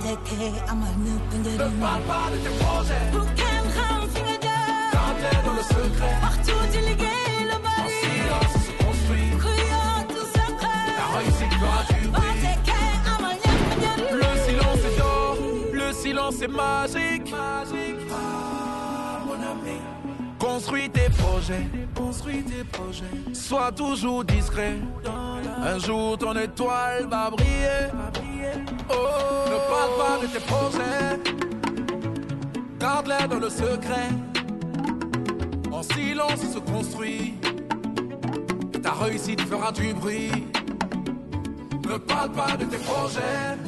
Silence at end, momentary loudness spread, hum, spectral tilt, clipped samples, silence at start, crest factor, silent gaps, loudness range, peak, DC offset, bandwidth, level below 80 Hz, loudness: 0 s; 8 LU; none; -5 dB/octave; under 0.1%; 0 s; 14 dB; none; 5 LU; -10 dBFS; under 0.1%; 12.5 kHz; -30 dBFS; -25 LUFS